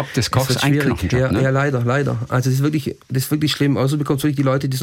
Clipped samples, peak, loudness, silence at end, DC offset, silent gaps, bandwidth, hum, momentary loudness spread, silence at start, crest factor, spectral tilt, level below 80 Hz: under 0.1%; -6 dBFS; -18 LUFS; 0 s; under 0.1%; none; 17 kHz; none; 3 LU; 0 s; 12 dB; -6 dB/octave; -44 dBFS